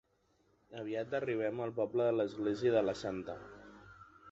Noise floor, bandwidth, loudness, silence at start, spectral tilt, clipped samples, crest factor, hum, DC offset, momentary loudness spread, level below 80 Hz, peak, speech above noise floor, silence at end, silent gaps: -74 dBFS; 8 kHz; -35 LUFS; 0.7 s; -5.5 dB/octave; under 0.1%; 18 dB; none; under 0.1%; 21 LU; -68 dBFS; -20 dBFS; 39 dB; 0 s; none